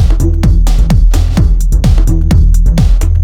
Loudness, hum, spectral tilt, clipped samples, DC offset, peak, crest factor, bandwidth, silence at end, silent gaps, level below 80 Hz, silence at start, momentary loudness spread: -11 LUFS; none; -7 dB/octave; under 0.1%; under 0.1%; 0 dBFS; 6 dB; 13 kHz; 0 s; none; -8 dBFS; 0 s; 2 LU